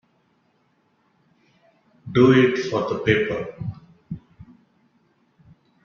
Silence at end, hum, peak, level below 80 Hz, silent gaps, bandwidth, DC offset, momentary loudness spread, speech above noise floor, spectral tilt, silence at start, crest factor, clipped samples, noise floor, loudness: 1.65 s; none; -4 dBFS; -56 dBFS; none; 7 kHz; under 0.1%; 23 LU; 46 dB; -7 dB/octave; 2.05 s; 20 dB; under 0.1%; -65 dBFS; -20 LUFS